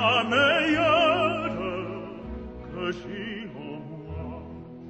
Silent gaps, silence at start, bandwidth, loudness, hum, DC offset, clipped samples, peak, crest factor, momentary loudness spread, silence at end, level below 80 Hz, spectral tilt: none; 0 s; 8.6 kHz; -24 LUFS; none; under 0.1%; under 0.1%; -8 dBFS; 18 dB; 18 LU; 0 s; -48 dBFS; -5 dB/octave